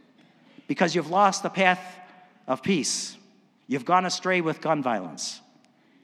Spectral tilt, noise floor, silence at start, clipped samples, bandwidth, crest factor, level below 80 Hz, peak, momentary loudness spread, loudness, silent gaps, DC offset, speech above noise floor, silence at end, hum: -3.5 dB/octave; -60 dBFS; 0.7 s; under 0.1%; 14 kHz; 22 dB; -80 dBFS; -4 dBFS; 12 LU; -25 LUFS; none; under 0.1%; 35 dB; 0.65 s; none